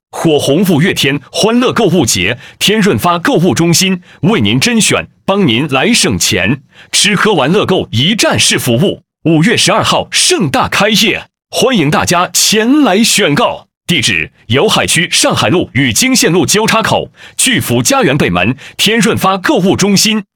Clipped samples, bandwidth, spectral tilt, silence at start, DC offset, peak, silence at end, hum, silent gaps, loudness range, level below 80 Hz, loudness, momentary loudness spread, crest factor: under 0.1%; 19.5 kHz; -3.5 dB/octave; 0.15 s; under 0.1%; 0 dBFS; 0.15 s; none; 13.77-13.81 s; 1 LU; -44 dBFS; -10 LUFS; 5 LU; 10 dB